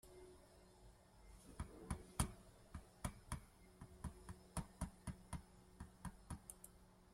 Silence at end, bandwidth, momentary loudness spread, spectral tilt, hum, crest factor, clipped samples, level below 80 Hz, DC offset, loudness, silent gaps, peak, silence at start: 0 s; 16 kHz; 19 LU; -4.5 dB/octave; none; 30 dB; under 0.1%; -58 dBFS; under 0.1%; -53 LUFS; none; -24 dBFS; 0.05 s